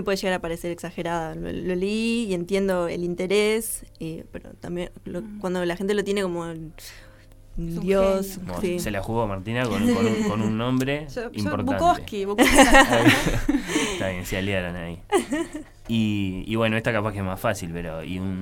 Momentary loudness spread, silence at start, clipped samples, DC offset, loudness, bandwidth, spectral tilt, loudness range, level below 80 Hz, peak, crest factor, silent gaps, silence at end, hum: 14 LU; 0 s; under 0.1%; under 0.1%; -23 LUFS; 17 kHz; -4.5 dB/octave; 8 LU; -38 dBFS; -2 dBFS; 22 dB; none; 0 s; none